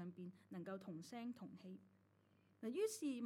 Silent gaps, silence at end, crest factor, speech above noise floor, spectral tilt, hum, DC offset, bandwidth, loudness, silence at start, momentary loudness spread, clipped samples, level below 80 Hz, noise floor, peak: none; 0 s; 18 dB; 27 dB; -5.5 dB/octave; none; under 0.1%; 16 kHz; -50 LUFS; 0 s; 15 LU; under 0.1%; under -90 dBFS; -76 dBFS; -32 dBFS